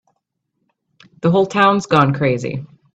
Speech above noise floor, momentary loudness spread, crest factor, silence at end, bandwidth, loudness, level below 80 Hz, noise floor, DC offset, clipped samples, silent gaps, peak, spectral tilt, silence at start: 58 dB; 11 LU; 18 dB; 0.3 s; 8.4 kHz; -16 LUFS; -54 dBFS; -73 dBFS; under 0.1%; under 0.1%; none; 0 dBFS; -6.5 dB/octave; 1.25 s